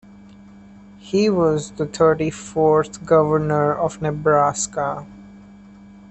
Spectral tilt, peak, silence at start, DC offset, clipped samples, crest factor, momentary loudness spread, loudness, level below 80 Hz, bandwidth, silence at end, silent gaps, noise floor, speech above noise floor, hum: -5.5 dB/octave; -4 dBFS; 1.05 s; under 0.1%; under 0.1%; 18 dB; 7 LU; -19 LUFS; -50 dBFS; 8.8 kHz; 0.75 s; none; -44 dBFS; 25 dB; none